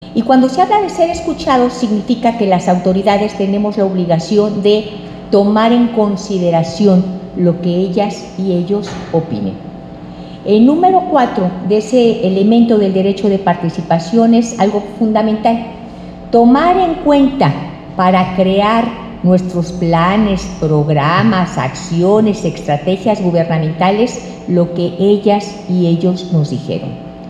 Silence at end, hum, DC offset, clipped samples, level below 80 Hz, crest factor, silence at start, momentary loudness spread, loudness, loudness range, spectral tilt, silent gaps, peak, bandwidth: 0 s; none; under 0.1%; under 0.1%; -40 dBFS; 12 dB; 0 s; 9 LU; -13 LUFS; 3 LU; -7 dB/octave; none; 0 dBFS; 9.2 kHz